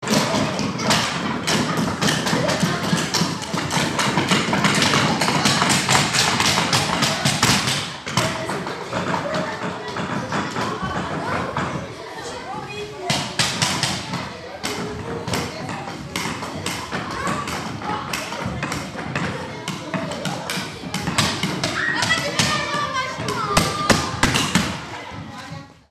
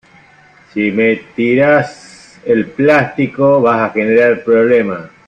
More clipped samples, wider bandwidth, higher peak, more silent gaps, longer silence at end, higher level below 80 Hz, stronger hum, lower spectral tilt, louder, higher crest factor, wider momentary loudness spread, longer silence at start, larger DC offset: neither; first, 14 kHz vs 9 kHz; about the same, -2 dBFS vs 0 dBFS; neither; about the same, 0.2 s vs 0.2 s; first, -46 dBFS vs -54 dBFS; neither; second, -3.5 dB/octave vs -7.5 dB/octave; second, -21 LUFS vs -12 LUFS; first, 22 dB vs 12 dB; first, 12 LU vs 7 LU; second, 0 s vs 0.75 s; neither